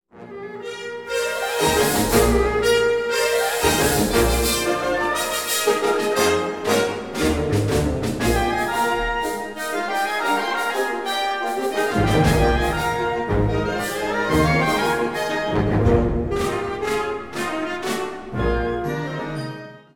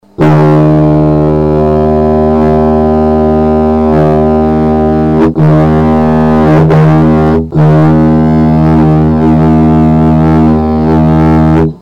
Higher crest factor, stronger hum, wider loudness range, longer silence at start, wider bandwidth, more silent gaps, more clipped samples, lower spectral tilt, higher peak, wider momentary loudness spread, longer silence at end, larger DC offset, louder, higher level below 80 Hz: first, 18 dB vs 4 dB; neither; first, 4 LU vs 1 LU; about the same, 0.15 s vs 0.2 s; first, 19.5 kHz vs 5.8 kHz; neither; neither; second, -4.5 dB/octave vs -10 dB/octave; about the same, -4 dBFS vs -2 dBFS; first, 9 LU vs 3 LU; about the same, 0.15 s vs 0.05 s; first, 0.3% vs under 0.1%; second, -21 LUFS vs -7 LUFS; second, -32 dBFS vs -20 dBFS